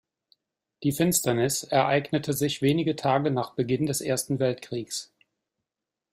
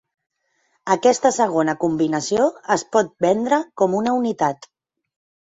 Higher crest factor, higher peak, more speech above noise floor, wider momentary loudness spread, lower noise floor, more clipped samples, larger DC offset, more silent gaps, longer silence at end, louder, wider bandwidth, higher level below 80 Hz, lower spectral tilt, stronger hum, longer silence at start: about the same, 20 dB vs 18 dB; second, -8 dBFS vs -2 dBFS; first, 62 dB vs 48 dB; first, 9 LU vs 5 LU; first, -88 dBFS vs -67 dBFS; neither; neither; neither; first, 1.1 s vs 0.95 s; second, -26 LUFS vs -19 LUFS; first, 16 kHz vs 8.2 kHz; about the same, -62 dBFS vs -62 dBFS; about the same, -4.5 dB/octave vs -4.5 dB/octave; neither; about the same, 0.8 s vs 0.85 s